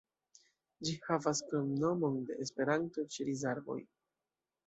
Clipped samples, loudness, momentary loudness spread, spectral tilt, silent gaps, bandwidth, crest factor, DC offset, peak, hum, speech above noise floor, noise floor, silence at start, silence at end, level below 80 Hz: under 0.1%; -36 LUFS; 7 LU; -5 dB/octave; none; 8.2 kHz; 20 dB; under 0.1%; -18 dBFS; none; over 54 dB; under -90 dBFS; 0.8 s; 0.85 s; -76 dBFS